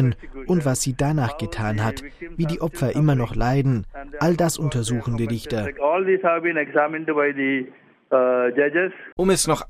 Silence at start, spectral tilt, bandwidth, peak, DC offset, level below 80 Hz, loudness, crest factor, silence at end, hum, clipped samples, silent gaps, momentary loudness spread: 0 s; -5.5 dB/octave; 16 kHz; -4 dBFS; under 0.1%; -40 dBFS; -22 LUFS; 16 dB; 0.05 s; none; under 0.1%; 9.12-9.17 s; 7 LU